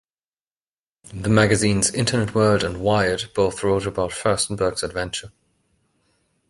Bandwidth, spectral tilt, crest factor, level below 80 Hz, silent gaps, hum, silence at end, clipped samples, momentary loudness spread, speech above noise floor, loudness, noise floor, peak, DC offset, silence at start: 11.5 kHz; -4.5 dB/octave; 20 dB; -44 dBFS; none; none; 1.2 s; under 0.1%; 9 LU; over 70 dB; -21 LUFS; under -90 dBFS; -2 dBFS; under 0.1%; 1.1 s